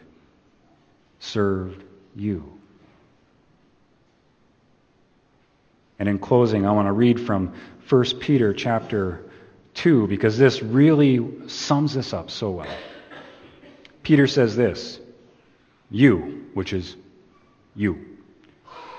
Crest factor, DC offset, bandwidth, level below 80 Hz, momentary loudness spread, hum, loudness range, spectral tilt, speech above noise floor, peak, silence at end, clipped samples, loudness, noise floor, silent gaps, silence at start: 22 dB; under 0.1%; 7.4 kHz; -56 dBFS; 19 LU; none; 11 LU; -7 dB/octave; 41 dB; -2 dBFS; 0 s; under 0.1%; -21 LUFS; -61 dBFS; none; 1.2 s